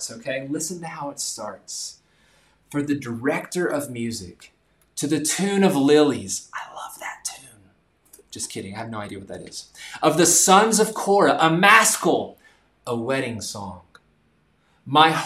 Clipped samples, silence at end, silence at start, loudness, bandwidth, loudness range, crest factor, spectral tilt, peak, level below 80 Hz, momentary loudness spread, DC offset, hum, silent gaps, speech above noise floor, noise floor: under 0.1%; 0 s; 0 s; -20 LUFS; 16 kHz; 12 LU; 22 dB; -3 dB/octave; 0 dBFS; -64 dBFS; 21 LU; under 0.1%; none; none; 42 dB; -63 dBFS